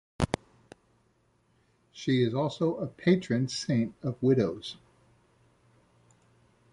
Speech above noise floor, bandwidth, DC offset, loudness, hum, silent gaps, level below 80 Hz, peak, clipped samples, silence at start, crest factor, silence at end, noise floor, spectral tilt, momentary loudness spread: 41 dB; 11.5 kHz; under 0.1%; -29 LUFS; none; none; -54 dBFS; -10 dBFS; under 0.1%; 0.2 s; 22 dB; 2 s; -69 dBFS; -6.5 dB/octave; 11 LU